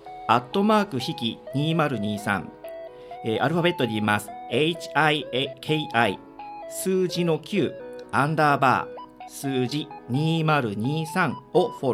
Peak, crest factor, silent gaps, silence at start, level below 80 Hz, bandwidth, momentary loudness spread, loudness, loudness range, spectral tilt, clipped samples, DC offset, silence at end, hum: -4 dBFS; 20 dB; none; 0 s; -64 dBFS; 16 kHz; 15 LU; -24 LUFS; 2 LU; -5.5 dB/octave; under 0.1%; under 0.1%; 0 s; none